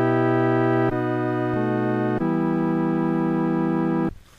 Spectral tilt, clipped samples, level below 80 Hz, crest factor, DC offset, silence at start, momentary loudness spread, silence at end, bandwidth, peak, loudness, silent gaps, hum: -9.5 dB/octave; under 0.1%; -50 dBFS; 12 dB; 0.2%; 0 s; 4 LU; 0.25 s; 5.6 kHz; -10 dBFS; -22 LUFS; none; none